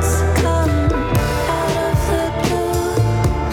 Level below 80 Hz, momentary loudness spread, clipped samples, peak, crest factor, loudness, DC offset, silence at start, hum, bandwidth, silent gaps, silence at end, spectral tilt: -26 dBFS; 2 LU; under 0.1%; -4 dBFS; 12 dB; -18 LUFS; under 0.1%; 0 s; none; 18 kHz; none; 0 s; -6 dB/octave